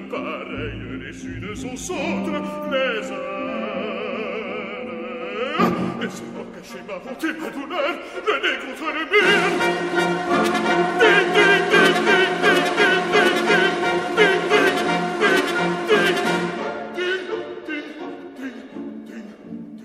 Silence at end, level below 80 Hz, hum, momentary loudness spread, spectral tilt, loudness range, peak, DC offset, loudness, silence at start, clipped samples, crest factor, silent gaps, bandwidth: 0 s; -54 dBFS; none; 18 LU; -4 dB/octave; 10 LU; 0 dBFS; under 0.1%; -20 LUFS; 0 s; under 0.1%; 20 dB; none; 15 kHz